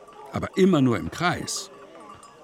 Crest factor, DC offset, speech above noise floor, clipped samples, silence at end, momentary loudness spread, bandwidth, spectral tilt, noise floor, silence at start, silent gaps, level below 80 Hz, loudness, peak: 18 dB; under 0.1%; 23 dB; under 0.1%; 0.15 s; 25 LU; 15.5 kHz; -5.5 dB/octave; -46 dBFS; 0 s; none; -54 dBFS; -24 LUFS; -6 dBFS